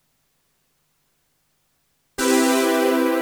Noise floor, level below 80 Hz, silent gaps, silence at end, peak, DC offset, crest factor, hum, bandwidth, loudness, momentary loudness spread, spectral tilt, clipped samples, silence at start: -68 dBFS; -60 dBFS; none; 0 s; -4 dBFS; under 0.1%; 18 dB; 50 Hz at -75 dBFS; over 20 kHz; -19 LUFS; 7 LU; -1.5 dB/octave; under 0.1%; 2.2 s